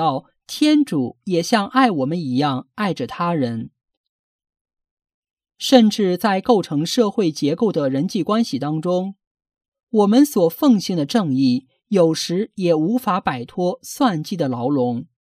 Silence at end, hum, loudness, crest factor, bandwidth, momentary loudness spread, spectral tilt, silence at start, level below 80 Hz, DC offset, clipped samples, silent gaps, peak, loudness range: 0.2 s; none; -19 LUFS; 18 dB; 15.5 kHz; 8 LU; -5.5 dB/octave; 0 s; -64 dBFS; under 0.1%; under 0.1%; 3.97-4.39 s, 4.61-4.65 s, 4.91-4.97 s, 5.14-5.23 s, 5.33-5.37 s, 9.27-9.35 s, 9.68-9.72 s, 9.83-9.87 s; -2 dBFS; 4 LU